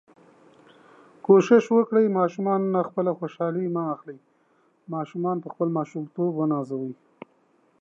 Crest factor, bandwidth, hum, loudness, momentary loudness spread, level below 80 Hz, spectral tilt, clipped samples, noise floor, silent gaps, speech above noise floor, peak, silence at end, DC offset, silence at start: 20 dB; 7.6 kHz; none; -24 LUFS; 15 LU; -82 dBFS; -8 dB/octave; under 0.1%; -64 dBFS; none; 41 dB; -4 dBFS; 0.9 s; under 0.1%; 1.3 s